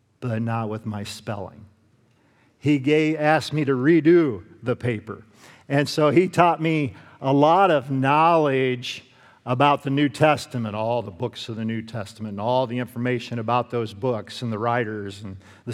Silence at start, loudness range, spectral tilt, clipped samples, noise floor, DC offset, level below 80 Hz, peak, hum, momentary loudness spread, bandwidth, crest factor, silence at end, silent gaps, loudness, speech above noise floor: 0.2 s; 7 LU; -6.5 dB/octave; under 0.1%; -60 dBFS; under 0.1%; -68 dBFS; 0 dBFS; none; 15 LU; 13.5 kHz; 22 dB; 0 s; none; -22 LUFS; 38 dB